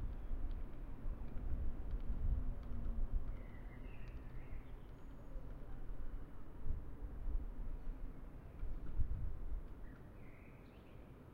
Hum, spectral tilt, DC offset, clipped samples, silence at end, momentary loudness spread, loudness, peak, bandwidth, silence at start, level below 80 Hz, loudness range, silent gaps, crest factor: none; -9 dB/octave; under 0.1%; under 0.1%; 0 s; 12 LU; -50 LUFS; -24 dBFS; 3.4 kHz; 0 s; -44 dBFS; 6 LU; none; 18 dB